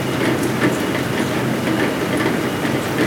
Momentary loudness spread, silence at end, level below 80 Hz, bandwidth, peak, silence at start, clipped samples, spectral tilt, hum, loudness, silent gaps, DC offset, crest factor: 2 LU; 0 s; -48 dBFS; 18.5 kHz; -4 dBFS; 0 s; under 0.1%; -5 dB/octave; none; -19 LUFS; none; under 0.1%; 14 dB